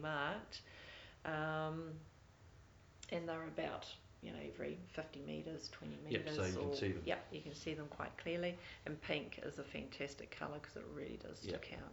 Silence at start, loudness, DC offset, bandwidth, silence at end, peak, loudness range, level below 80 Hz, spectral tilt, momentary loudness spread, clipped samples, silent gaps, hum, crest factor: 0 s; -46 LUFS; under 0.1%; over 20 kHz; 0 s; -22 dBFS; 4 LU; -66 dBFS; -5.5 dB/octave; 14 LU; under 0.1%; none; none; 24 dB